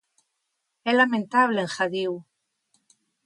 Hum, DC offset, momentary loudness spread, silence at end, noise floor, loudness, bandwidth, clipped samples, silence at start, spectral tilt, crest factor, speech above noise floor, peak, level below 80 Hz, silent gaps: none; under 0.1%; 11 LU; 1.05 s; -78 dBFS; -23 LUFS; 11.5 kHz; under 0.1%; 0.85 s; -4.5 dB/octave; 20 dB; 55 dB; -6 dBFS; -78 dBFS; none